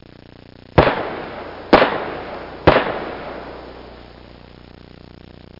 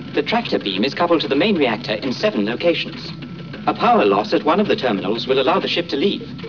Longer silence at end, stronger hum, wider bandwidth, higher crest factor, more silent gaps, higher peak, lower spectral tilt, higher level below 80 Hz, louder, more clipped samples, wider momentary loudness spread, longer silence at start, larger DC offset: first, 0.9 s vs 0 s; first, 60 Hz at -45 dBFS vs none; about the same, 5.8 kHz vs 5.4 kHz; first, 20 dB vs 12 dB; neither; first, -2 dBFS vs -6 dBFS; first, -8 dB/octave vs -6 dB/octave; first, -38 dBFS vs -54 dBFS; about the same, -18 LUFS vs -18 LUFS; neither; first, 22 LU vs 7 LU; first, 0.75 s vs 0 s; second, under 0.1% vs 0.2%